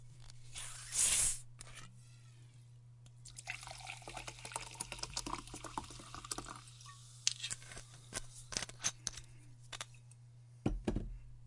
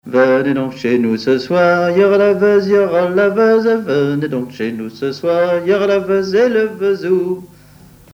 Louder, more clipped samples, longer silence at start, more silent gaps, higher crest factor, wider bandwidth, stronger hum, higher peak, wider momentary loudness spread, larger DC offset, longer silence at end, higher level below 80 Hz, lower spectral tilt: second, -40 LUFS vs -14 LUFS; neither; about the same, 0 s vs 0.05 s; neither; first, 34 dB vs 14 dB; second, 11.5 kHz vs 15.5 kHz; second, none vs 50 Hz at -55 dBFS; second, -10 dBFS vs 0 dBFS; first, 23 LU vs 9 LU; neither; second, 0 s vs 0.7 s; about the same, -54 dBFS vs -56 dBFS; second, -1.5 dB/octave vs -7 dB/octave